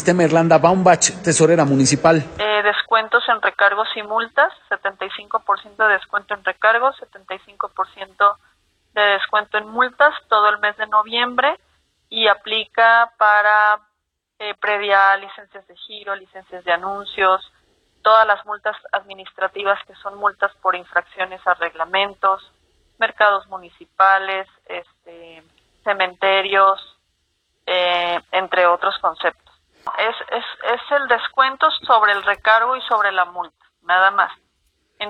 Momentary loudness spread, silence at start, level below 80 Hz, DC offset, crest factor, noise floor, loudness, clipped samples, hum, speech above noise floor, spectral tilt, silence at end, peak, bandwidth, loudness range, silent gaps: 14 LU; 0 s; -60 dBFS; under 0.1%; 18 dB; -75 dBFS; -17 LUFS; under 0.1%; none; 57 dB; -3 dB/octave; 0 s; 0 dBFS; 9.6 kHz; 5 LU; none